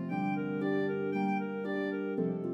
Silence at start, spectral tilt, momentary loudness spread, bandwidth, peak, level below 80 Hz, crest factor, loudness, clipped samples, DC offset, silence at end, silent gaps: 0 s; -9 dB/octave; 2 LU; 5.8 kHz; -20 dBFS; -84 dBFS; 12 dB; -33 LUFS; under 0.1%; under 0.1%; 0 s; none